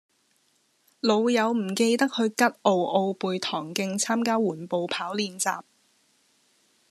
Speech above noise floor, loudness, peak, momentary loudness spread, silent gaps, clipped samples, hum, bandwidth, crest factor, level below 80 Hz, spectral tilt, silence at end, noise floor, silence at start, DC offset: 43 dB; -25 LUFS; -6 dBFS; 7 LU; none; under 0.1%; none; 13.5 kHz; 22 dB; -82 dBFS; -4 dB/octave; 1.3 s; -68 dBFS; 1.05 s; under 0.1%